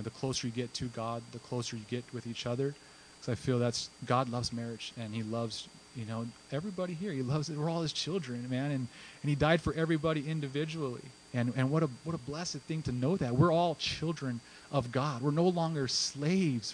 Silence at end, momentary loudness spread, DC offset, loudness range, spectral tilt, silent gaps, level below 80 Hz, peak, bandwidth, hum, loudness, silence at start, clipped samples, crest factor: 0 s; 10 LU; under 0.1%; 5 LU; -5.5 dB/octave; none; -60 dBFS; -12 dBFS; 10 kHz; none; -34 LUFS; 0 s; under 0.1%; 22 dB